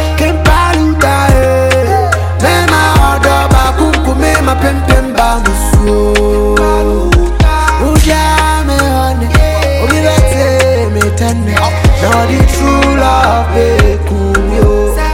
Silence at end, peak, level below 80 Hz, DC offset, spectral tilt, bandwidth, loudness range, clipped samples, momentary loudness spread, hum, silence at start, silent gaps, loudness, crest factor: 0 s; 0 dBFS; -14 dBFS; under 0.1%; -5.5 dB/octave; 16.5 kHz; 1 LU; under 0.1%; 3 LU; none; 0 s; none; -9 LUFS; 8 dB